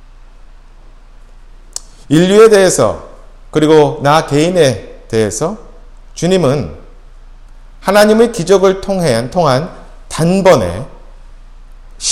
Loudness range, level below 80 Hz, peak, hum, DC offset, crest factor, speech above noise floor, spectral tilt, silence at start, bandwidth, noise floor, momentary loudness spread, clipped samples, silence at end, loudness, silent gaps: 5 LU; -34 dBFS; 0 dBFS; none; under 0.1%; 12 dB; 27 dB; -5 dB/octave; 2.1 s; 16 kHz; -37 dBFS; 19 LU; 0.3%; 0 s; -11 LUFS; none